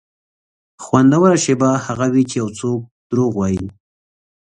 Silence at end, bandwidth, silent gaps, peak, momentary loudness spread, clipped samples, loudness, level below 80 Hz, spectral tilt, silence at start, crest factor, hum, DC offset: 0.7 s; 10 kHz; 2.91-3.10 s; 0 dBFS; 12 LU; under 0.1%; -16 LUFS; -48 dBFS; -6 dB/octave; 0.8 s; 16 dB; none; under 0.1%